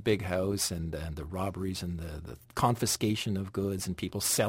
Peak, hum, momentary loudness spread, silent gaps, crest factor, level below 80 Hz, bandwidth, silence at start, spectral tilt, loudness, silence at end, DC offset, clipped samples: -14 dBFS; none; 10 LU; none; 18 dB; -50 dBFS; 16.5 kHz; 0 s; -4.5 dB/octave; -32 LUFS; 0 s; under 0.1%; under 0.1%